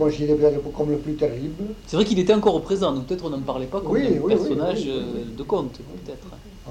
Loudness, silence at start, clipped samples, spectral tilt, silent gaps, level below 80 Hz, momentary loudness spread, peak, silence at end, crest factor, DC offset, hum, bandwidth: -23 LUFS; 0 s; under 0.1%; -6.5 dB/octave; none; -44 dBFS; 17 LU; -4 dBFS; 0 s; 18 dB; under 0.1%; none; 9.8 kHz